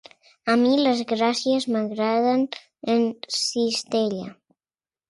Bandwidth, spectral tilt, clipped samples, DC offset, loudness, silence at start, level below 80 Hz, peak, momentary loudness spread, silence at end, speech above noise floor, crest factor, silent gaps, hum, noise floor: 11.5 kHz; -4 dB/octave; under 0.1%; under 0.1%; -23 LUFS; 0.45 s; -72 dBFS; -6 dBFS; 10 LU; 0.75 s; over 68 dB; 16 dB; none; none; under -90 dBFS